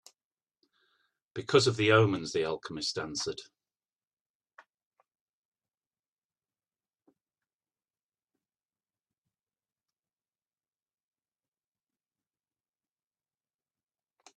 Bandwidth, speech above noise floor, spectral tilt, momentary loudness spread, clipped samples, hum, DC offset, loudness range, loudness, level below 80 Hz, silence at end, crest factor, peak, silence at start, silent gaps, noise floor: 11.5 kHz; over 62 dB; -4.5 dB/octave; 17 LU; under 0.1%; none; under 0.1%; 14 LU; -28 LUFS; -72 dBFS; 10.95 s; 28 dB; -8 dBFS; 1.35 s; none; under -90 dBFS